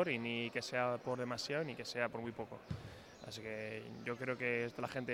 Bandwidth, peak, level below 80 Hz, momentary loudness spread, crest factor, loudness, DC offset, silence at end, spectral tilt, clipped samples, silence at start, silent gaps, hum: 16.5 kHz; -20 dBFS; -70 dBFS; 11 LU; 20 dB; -41 LUFS; under 0.1%; 0 s; -5 dB/octave; under 0.1%; 0 s; none; none